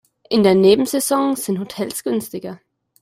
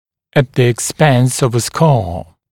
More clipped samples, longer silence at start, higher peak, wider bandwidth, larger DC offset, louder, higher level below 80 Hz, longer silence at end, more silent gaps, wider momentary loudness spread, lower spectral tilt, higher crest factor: neither; about the same, 0.3 s vs 0.35 s; about the same, -2 dBFS vs 0 dBFS; about the same, 16 kHz vs 17 kHz; neither; second, -17 LUFS vs -14 LUFS; second, -58 dBFS vs -42 dBFS; first, 0.45 s vs 0.3 s; neither; first, 15 LU vs 6 LU; about the same, -5 dB/octave vs -5.5 dB/octave; about the same, 16 dB vs 14 dB